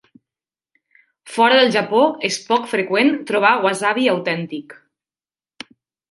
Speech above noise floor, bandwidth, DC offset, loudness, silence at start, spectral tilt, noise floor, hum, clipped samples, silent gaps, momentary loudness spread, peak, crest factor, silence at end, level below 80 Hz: over 73 dB; 11.5 kHz; under 0.1%; -17 LUFS; 1.25 s; -4 dB/octave; under -90 dBFS; none; under 0.1%; none; 19 LU; -2 dBFS; 18 dB; 1.4 s; -72 dBFS